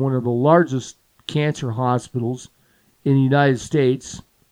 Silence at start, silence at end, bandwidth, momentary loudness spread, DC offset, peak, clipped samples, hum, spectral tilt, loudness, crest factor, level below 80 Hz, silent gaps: 0 s; 0.3 s; 11 kHz; 18 LU; under 0.1%; -2 dBFS; under 0.1%; none; -7 dB/octave; -20 LUFS; 18 dB; -56 dBFS; none